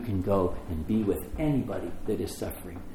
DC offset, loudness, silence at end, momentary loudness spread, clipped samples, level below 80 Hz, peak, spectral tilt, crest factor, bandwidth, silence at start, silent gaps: under 0.1%; -30 LUFS; 0 s; 9 LU; under 0.1%; -42 dBFS; -12 dBFS; -7.5 dB/octave; 16 dB; 20 kHz; 0 s; none